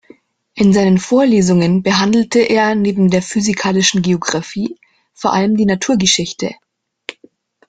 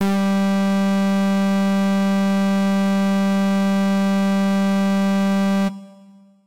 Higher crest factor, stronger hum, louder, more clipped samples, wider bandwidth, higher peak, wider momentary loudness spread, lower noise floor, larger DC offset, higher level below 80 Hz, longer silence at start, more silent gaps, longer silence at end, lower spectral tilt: first, 14 dB vs 4 dB; neither; first, -14 LUFS vs -19 LUFS; neither; second, 9.2 kHz vs 15 kHz; first, 0 dBFS vs -14 dBFS; first, 12 LU vs 0 LU; about the same, -49 dBFS vs -48 dBFS; second, under 0.1% vs 1%; first, -50 dBFS vs -56 dBFS; first, 0.55 s vs 0 s; neither; first, 1.15 s vs 0 s; second, -4.5 dB/octave vs -7 dB/octave